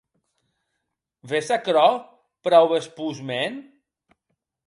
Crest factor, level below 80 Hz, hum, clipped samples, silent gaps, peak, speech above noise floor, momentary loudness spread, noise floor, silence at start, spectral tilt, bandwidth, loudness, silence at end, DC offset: 20 dB; -76 dBFS; none; under 0.1%; none; -4 dBFS; 59 dB; 14 LU; -80 dBFS; 1.25 s; -4.5 dB/octave; 11.5 kHz; -22 LUFS; 1.05 s; under 0.1%